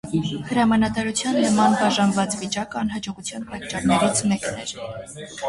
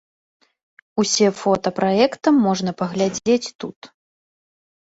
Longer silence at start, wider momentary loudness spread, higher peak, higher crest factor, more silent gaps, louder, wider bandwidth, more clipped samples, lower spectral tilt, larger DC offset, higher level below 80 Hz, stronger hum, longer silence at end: second, 0.05 s vs 0.95 s; about the same, 13 LU vs 12 LU; second, -6 dBFS vs -2 dBFS; about the same, 16 dB vs 18 dB; second, none vs 3.55-3.59 s, 3.76-3.82 s; second, -22 LUFS vs -19 LUFS; first, 11.5 kHz vs 8 kHz; neither; about the same, -4.5 dB/octave vs -4.5 dB/octave; neither; first, -50 dBFS vs -62 dBFS; neither; second, 0 s vs 1 s